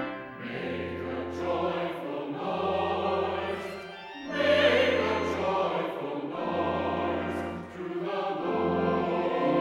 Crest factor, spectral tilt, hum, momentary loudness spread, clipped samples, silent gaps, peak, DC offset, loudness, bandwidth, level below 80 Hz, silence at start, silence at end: 20 dB; -6 dB/octave; none; 12 LU; under 0.1%; none; -10 dBFS; under 0.1%; -29 LUFS; 15 kHz; -58 dBFS; 0 s; 0 s